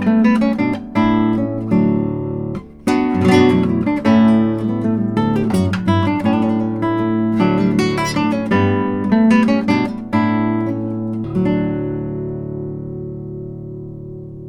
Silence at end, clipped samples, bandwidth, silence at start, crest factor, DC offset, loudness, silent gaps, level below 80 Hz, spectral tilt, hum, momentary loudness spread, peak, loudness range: 0 s; under 0.1%; 11 kHz; 0 s; 16 dB; under 0.1%; -17 LUFS; none; -44 dBFS; -7.5 dB/octave; none; 14 LU; 0 dBFS; 6 LU